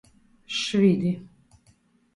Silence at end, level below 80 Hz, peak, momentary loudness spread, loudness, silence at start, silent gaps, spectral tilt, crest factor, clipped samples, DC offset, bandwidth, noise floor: 0.9 s; -66 dBFS; -10 dBFS; 11 LU; -24 LUFS; 0.5 s; none; -6 dB/octave; 18 dB; under 0.1%; under 0.1%; 11 kHz; -62 dBFS